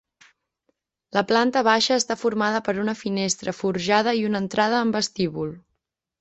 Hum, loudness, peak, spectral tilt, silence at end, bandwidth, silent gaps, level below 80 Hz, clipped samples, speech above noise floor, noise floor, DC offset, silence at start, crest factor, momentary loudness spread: none; -22 LUFS; -4 dBFS; -3.5 dB/octave; 0.6 s; 8.4 kHz; none; -62 dBFS; under 0.1%; 56 dB; -78 dBFS; under 0.1%; 1.15 s; 20 dB; 7 LU